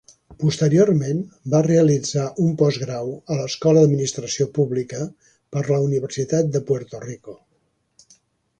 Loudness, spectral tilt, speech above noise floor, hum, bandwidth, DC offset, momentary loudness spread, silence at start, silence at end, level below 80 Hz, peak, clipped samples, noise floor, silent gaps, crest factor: -20 LUFS; -6.5 dB/octave; 48 dB; none; 9.4 kHz; under 0.1%; 13 LU; 0.3 s; 1.25 s; -58 dBFS; -4 dBFS; under 0.1%; -67 dBFS; none; 16 dB